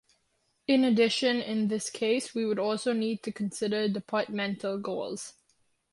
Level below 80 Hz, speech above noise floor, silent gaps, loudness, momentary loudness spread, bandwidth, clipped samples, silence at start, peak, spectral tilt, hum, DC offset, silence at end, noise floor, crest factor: -74 dBFS; 46 dB; none; -29 LUFS; 10 LU; 11.5 kHz; under 0.1%; 0.7 s; -12 dBFS; -4.5 dB/octave; none; under 0.1%; 0.6 s; -74 dBFS; 18 dB